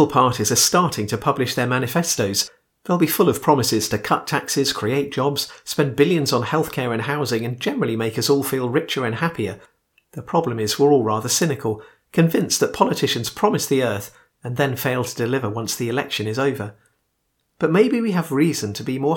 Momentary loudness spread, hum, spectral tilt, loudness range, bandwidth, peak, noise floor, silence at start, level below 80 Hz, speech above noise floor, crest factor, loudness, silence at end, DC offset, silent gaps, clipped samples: 9 LU; none; -4.5 dB/octave; 3 LU; 19 kHz; 0 dBFS; -71 dBFS; 0 s; -58 dBFS; 51 dB; 20 dB; -20 LUFS; 0 s; under 0.1%; none; under 0.1%